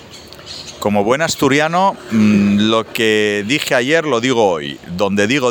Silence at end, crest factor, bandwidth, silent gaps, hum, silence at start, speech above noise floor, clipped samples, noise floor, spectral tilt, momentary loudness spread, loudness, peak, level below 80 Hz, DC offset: 0 s; 14 dB; over 20 kHz; none; none; 0 s; 21 dB; under 0.1%; -36 dBFS; -4.5 dB/octave; 12 LU; -15 LUFS; 0 dBFS; -52 dBFS; under 0.1%